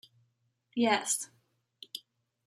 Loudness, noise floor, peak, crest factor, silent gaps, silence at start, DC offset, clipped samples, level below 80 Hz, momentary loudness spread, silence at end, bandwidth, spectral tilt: -30 LUFS; -76 dBFS; -12 dBFS; 24 dB; none; 0.75 s; under 0.1%; under 0.1%; -86 dBFS; 17 LU; 0.45 s; 14 kHz; -2 dB/octave